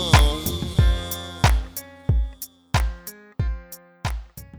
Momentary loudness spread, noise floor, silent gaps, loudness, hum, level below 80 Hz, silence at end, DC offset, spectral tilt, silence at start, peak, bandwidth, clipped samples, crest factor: 15 LU; -40 dBFS; none; -24 LUFS; none; -26 dBFS; 0 s; under 0.1%; -4.5 dB/octave; 0 s; 0 dBFS; over 20 kHz; under 0.1%; 22 dB